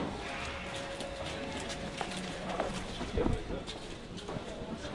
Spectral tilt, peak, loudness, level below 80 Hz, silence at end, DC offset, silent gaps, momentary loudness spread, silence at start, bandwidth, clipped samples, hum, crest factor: -4.5 dB/octave; -18 dBFS; -38 LUFS; -46 dBFS; 0 s; under 0.1%; none; 7 LU; 0 s; 11.5 kHz; under 0.1%; none; 20 dB